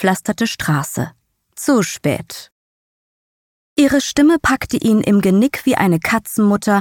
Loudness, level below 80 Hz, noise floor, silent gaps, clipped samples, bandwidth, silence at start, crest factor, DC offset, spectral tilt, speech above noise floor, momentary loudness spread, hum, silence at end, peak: -16 LUFS; -46 dBFS; under -90 dBFS; 2.52-3.76 s; under 0.1%; 18.5 kHz; 0 s; 16 dB; under 0.1%; -5 dB/octave; over 75 dB; 10 LU; none; 0 s; -2 dBFS